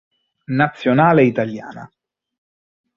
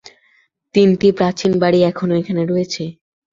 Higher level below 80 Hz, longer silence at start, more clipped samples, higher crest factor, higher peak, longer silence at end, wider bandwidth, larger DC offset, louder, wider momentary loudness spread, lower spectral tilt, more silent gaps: about the same, -58 dBFS vs -54 dBFS; second, 0.5 s vs 0.75 s; neither; about the same, 18 dB vs 16 dB; about the same, -2 dBFS vs -2 dBFS; first, 1.1 s vs 0.4 s; about the same, 7 kHz vs 7.6 kHz; neither; about the same, -16 LUFS vs -16 LUFS; first, 16 LU vs 9 LU; first, -8.5 dB/octave vs -6.5 dB/octave; neither